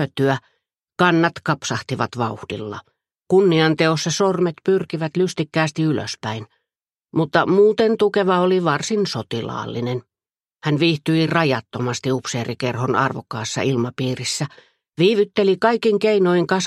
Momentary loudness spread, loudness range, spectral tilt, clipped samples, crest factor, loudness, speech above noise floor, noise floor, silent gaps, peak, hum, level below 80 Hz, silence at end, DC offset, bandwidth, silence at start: 11 LU; 3 LU; -5.5 dB/octave; under 0.1%; 18 dB; -20 LUFS; over 71 dB; under -90 dBFS; none; -2 dBFS; none; -62 dBFS; 0 s; under 0.1%; 12.5 kHz; 0 s